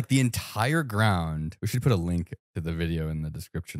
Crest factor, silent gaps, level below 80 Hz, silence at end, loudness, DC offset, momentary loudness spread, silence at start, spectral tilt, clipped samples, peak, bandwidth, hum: 20 dB; 2.39-2.54 s; -44 dBFS; 0 s; -28 LUFS; under 0.1%; 10 LU; 0 s; -6 dB/octave; under 0.1%; -8 dBFS; 16 kHz; none